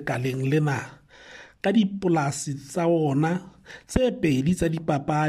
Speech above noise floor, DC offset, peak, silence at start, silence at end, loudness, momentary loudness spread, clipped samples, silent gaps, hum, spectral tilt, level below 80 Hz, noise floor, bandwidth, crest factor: 23 dB; under 0.1%; -6 dBFS; 0 s; 0 s; -25 LUFS; 13 LU; under 0.1%; none; none; -6.5 dB/octave; -48 dBFS; -47 dBFS; 14.5 kHz; 18 dB